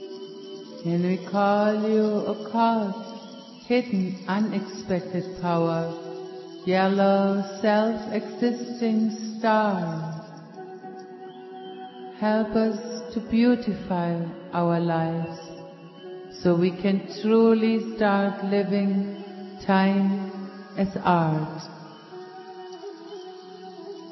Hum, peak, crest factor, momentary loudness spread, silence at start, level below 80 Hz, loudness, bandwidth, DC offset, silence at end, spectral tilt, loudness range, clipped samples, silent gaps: none; -8 dBFS; 18 dB; 19 LU; 0 s; -62 dBFS; -24 LUFS; 6 kHz; under 0.1%; 0 s; -7.5 dB/octave; 6 LU; under 0.1%; none